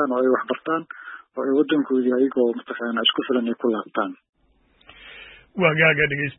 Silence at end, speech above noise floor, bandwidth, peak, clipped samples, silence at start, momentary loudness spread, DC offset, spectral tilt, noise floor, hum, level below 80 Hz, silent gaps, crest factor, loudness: 0.05 s; 39 dB; 4 kHz; -2 dBFS; under 0.1%; 0 s; 20 LU; under 0.1%; -10 dB/octave; -61 dBFS; none; -60 dBFS; 4.29-4.33 s; 20 dB; -21 LUFS